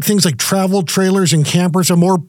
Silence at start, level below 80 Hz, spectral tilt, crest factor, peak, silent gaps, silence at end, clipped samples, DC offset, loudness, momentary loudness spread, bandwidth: 0 s; -62 dBFS; -5 dB/octave; 14 dB; 0 dBFS; none; 0.05 s; under 0.1%; under 0.1%; -13 LUFS; 3 LU; 18 kHz